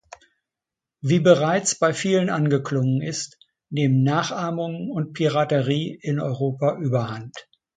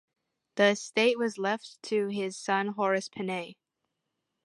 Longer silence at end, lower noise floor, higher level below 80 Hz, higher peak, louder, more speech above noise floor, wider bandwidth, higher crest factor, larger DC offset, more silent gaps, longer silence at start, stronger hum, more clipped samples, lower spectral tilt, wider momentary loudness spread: second, 0.35 s vs 0.9 s; first, -88 dBFS vs -83 dBFS; first, -64 dBFS vs -82 dBFS; first, -2 dBFS vs -10 dBFS; first, -22 LUFS vs -29 LUFS; first, 66 dB vs 54 dB; second, 9.4 kHz vs 11.5 kHz; about the same, 20 dB vs 20 dB; neither; neither; first, 1.05 s vs 0.55 s; neither; neither; first, -5.5 dB/octave vs -4 dB/octave; first, 13 LU vs 10 LU